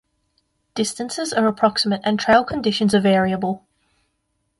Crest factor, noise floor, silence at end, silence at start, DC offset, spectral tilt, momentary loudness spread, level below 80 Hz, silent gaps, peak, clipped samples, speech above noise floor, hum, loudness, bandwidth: 18 dB; -71 dBFS; 1 s; 0.75 s; under 0.1%; -4.5 dB/octave; 9 LU; -54 dBFS; none; -4 dBFS; under 0.1%; 53 dB; none; -19 LUFS; 11.5 kHz